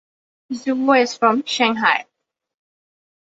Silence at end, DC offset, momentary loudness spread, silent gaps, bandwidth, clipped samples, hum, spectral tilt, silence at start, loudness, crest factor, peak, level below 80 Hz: 1.2 s; under 0.1%; 9 LU; none; 8 kHz; under 0.1%; none; -3 dB/octave; 0.5 s; -18 LUFS; 20 dB; -2 dBFS; -68 dBFS